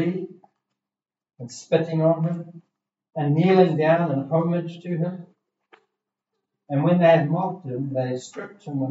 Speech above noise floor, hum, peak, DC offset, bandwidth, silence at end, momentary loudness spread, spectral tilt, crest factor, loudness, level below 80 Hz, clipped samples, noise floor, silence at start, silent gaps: 68 dB; none; -4 dBFS; under 0.1%; 8 kHz; 0 s; 20 LU; -8 dB/octave; 20 dB; -22 LUFS; -80 dBFS; under 0.1%; -90 dBFS; 0 s; none